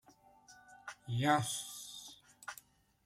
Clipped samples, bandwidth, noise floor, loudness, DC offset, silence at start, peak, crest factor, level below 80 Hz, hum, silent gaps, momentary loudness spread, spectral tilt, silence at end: under 0.1%; 16 kHz; -63 dBFS; -36 LUFS; under 0.1%; 0.5 s; -16 dBFS; 24 dB; -74 dBFS; none; none; 21 LU; -4 dB/octave; 0.5 s